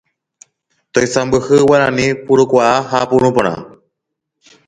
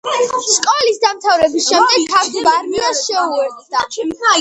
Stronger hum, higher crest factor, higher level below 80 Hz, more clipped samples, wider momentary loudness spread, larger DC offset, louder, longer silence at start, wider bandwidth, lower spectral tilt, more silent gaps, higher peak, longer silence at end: neither; about the same, 14 dB vs 14 dB; first, -46 dBFS vs -56 dBFS; neither; about the same, 7 LU vs 8 LU; neither; about the same, -13 LUFS vs -14 LUFS; first, 0.95 s vs 0.05 s; about the same, 10.5 kHz vs 11 kHz; first, -5 dB/octave vs -0.5 dB/octave; neither; about the same, 0 dBFS vs 0 dBFS; first, 1 s vs 0 s